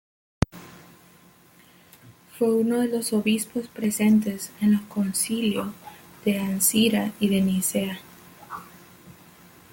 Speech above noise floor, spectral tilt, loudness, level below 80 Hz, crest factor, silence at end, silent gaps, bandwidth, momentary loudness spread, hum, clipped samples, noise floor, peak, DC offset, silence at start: 31 dB; -4.5 dB/octave; -24 LUFS; -50 dBFS; 22 dB; 0.6 s; none; 17 kHz; 19 LU; none; under 0.1%; -54 dBFS; -2 dBFS; under 0.1%; 0.55 s